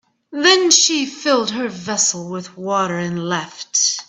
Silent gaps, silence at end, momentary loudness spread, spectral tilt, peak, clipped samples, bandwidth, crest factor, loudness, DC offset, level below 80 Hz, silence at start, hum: none; 0.05 s; 14 LU; -2 dB/octave; 0 dBFS; under 0.1%; 10 kHz; 18 dB; -16 LUFS; under 0.1%; -66 dBFS; 0.3 s; none